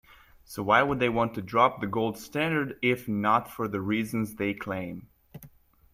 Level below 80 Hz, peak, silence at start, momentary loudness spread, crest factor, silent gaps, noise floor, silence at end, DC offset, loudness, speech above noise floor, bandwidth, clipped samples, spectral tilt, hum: -58 dBFS; -6 dBFS; 0.5 s; 11 LU; 22 dB; none; -55 dBFS; 0.45 s; under 0.1%; -27 LUFS; 28 dB; 16 kHz; under 0.1%; -6 dB/octave; none